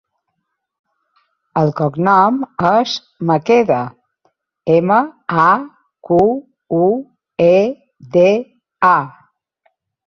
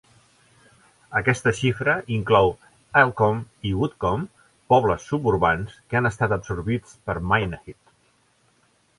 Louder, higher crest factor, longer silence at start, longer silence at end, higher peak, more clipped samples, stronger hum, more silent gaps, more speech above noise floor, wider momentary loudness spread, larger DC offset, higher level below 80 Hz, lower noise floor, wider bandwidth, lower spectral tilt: first, -15 LUFS vs -22 LUFS; second, 14 dB vs 20 dB; first, 1.55 s vs 1.1 s; second, 1 s vs 1.25 s; about the same, -2 dBFS vs -2 dBFS; neither; neither; neither; first, 60 dB vs 41 dB; about the same, 11 LU vs 10 LU; neither; second, -56 dBFS vs -44 dBFS; first, -73 dBFS vs -63 dBFS; second, 6.8 kHz vs 11.5 kHz; about the same, -7 dB/octave vs -6 dB/octave